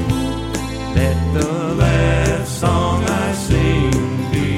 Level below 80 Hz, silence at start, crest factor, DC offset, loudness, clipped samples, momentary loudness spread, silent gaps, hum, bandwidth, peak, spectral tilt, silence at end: -26 dBFS; 0 s; 14 dB; under 0.1%; -18 LUFS; under 0.1%; 6 LU; none; none; 15.5 kHz; -2 dBFS; -6 dB/octave; 0 s